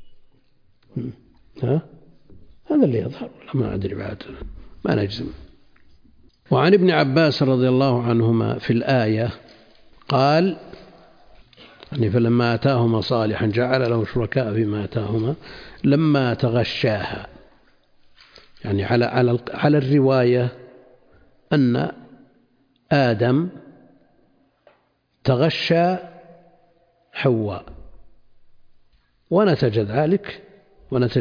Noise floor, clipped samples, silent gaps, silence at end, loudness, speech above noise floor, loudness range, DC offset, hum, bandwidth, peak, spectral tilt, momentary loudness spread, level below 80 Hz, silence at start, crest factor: -65 dBFS; under 0.1%; none; 0 s; -20 LUFS; 46 dB; 6 LU; under 0.1%; none; 5.2 kHz; -4 dBFS; -8.5 dB/octave; 15 LU; -50 dBFS; 0 s; 18 dB